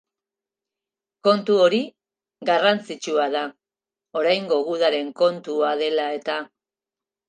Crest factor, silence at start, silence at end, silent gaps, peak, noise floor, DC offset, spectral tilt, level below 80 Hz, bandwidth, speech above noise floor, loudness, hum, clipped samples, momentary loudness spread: 20 dB; 1.25 s; 0.8 s; none; -4 dBFS; under -90 dBFS; under 0.1%; -4.5 dB/octave; -80 dBFS; 9.4 kHz; over 69 dB; -22 LUFS; none; under 0.1%; 12 LU